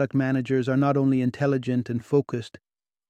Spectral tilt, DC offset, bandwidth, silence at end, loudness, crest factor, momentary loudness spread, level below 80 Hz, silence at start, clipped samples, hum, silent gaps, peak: -8.5 dB/octave; under 0.1%; 8.8 kHz; 0.6 s; -24 LUFS; 16 dB; 9 LU; -64 dBFS; 0 s; under 0.1%; none; none; -8 dBFS